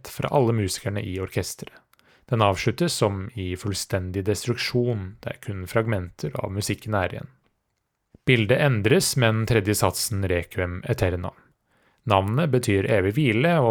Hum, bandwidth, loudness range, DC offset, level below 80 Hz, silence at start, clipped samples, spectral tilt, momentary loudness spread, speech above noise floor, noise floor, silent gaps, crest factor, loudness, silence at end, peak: none; 19.5 kHz; 5 LU; under 0.1%; -52 dBFS; 0.05 s; under 0.1%; -5 dB/octave; 12 LU; 53 dB; -76 dBFS; none; 22 dB; -24 LUFS; 0 s; -2 dBFS